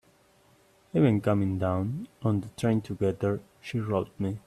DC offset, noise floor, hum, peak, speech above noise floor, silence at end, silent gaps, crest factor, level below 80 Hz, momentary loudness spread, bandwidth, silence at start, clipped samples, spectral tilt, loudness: under 0.1%; -62 dBFS; none; -10 dBFS; 35 dB; 0.05 s; none; 18 dB; -62 dBFS; 9 LU; 13 kHz; 0.95 s; under 0.1%; -8.5 dB/octave; -29 LUFS